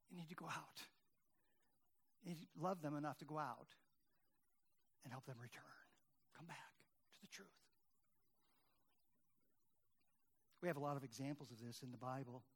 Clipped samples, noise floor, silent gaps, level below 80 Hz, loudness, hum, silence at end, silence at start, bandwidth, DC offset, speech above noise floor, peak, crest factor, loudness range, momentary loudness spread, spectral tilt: under 0.1%; -87 dBFS; none; under -90 dBFS; -52 LUFS; none; 0.15 s; 0.1 s; 19 kHz; under 0.1%; 36 dB; -30 dBFS; 24 dB; 13 LU; 18 LU; -5.5 dB/octave